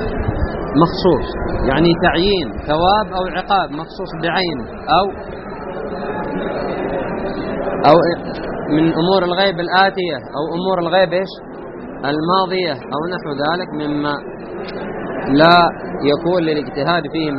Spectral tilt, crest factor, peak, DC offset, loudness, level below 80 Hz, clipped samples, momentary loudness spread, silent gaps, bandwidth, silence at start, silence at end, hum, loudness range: -4 dB/octave; 18 dB; 0 dBFS; under 0.1%; -17 LUFS; -34 dBFS; under 0.1%; 12 LU; none; 5.8 kHz; 0 s; 0 s; none; 5 LU